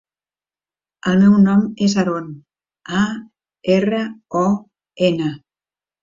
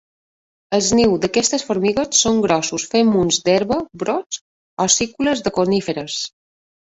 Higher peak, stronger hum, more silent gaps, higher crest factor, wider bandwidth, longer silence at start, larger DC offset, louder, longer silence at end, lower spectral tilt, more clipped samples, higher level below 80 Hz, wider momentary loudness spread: about the same, -4 dBFS vs -2 dBFS; neither; second, none vs 4.26-4.30 s, 4.41-4.77 s; about the same, 14 dB vs 18 dB; second, 7.6 kHz vs 8.4 kHz; first, 1.05 s vs 0.7 s; neither; about the same, -18 LUFS vs -18 LUFS; about the same, 0.65 s vs 0.6 s; first, -6.5 dB/octave vs -3.5 dB/octave; neither; second, -56 dBFS vs -48 dBFS; first, 14 LU vs 9 LU